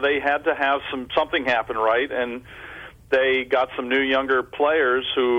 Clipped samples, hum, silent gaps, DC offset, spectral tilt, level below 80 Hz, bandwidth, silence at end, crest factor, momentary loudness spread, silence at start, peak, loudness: under 0.1%; none; none; under 0.1%; -5 dB/octave; -54 dBFS; 8 kHz; 0 s; 14 dB; 10 LU; 0 s; -8 dBFS; -21 LUFS